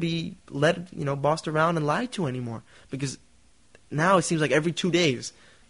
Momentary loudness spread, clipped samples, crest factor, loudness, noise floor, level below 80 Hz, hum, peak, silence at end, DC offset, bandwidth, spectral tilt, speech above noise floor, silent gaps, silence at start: 14 LU; under 0.1%; 18 dB; -26 LUFS; -59 dBFS; -60 dBFS; none; -8 dBFS; 0.4 s; 0.1%; 11 kHz; -5 dB/octave; 33 dB; none; 0 s